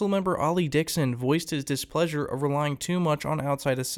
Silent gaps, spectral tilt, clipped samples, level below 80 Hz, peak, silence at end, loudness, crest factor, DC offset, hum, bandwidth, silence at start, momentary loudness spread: none; -5.5 dB/octave; under 0.1%; -56 dBFS; -10 dBFS; 0 s; -27 LUFS; 16 dB; under 0.1%; none; 18.5 kHz; 0 s; 3 LU